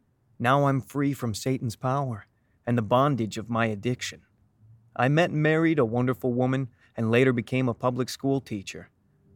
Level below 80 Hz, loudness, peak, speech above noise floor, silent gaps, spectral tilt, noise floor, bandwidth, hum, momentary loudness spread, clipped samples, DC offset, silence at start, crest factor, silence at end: -64 dBFS; -26 LUFS; -8 dBFS; 32 dB; none; -6.5 dB/octave; -57 dBFS; 17.5 kHz; none; 13 LU; under 0.1%; under 0.1%; 0.4 s; 18 dB; 0.5 s